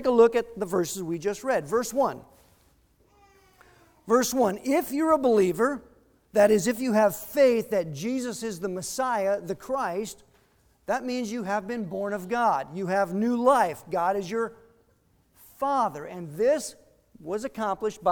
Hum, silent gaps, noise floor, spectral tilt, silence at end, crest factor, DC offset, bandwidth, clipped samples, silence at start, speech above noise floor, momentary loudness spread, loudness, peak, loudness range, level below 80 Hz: none; none; -65 dBFS; -5 dB/octave; 0 s; 18 dB; under 0.1%; over 20 kHz; under 0.1%; 0 s; 40 dB; 11 LU; -26 LUFS; -8 dBFS; 7 LU; -62 dBFS